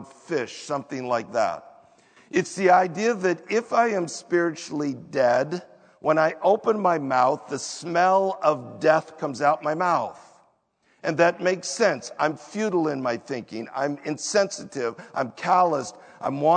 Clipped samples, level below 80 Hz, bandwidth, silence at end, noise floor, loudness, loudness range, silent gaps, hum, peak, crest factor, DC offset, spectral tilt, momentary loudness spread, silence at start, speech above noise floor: under 0.1%; -76 dBFS; 9.4 kHz; 0 s; -66 dBFS; -24 LUFS; 3 LU; none; none; -4 dBFS; 20 dB; under 0.1%; -4.5 dB/octave; 10 LU; 0 s; 42 dB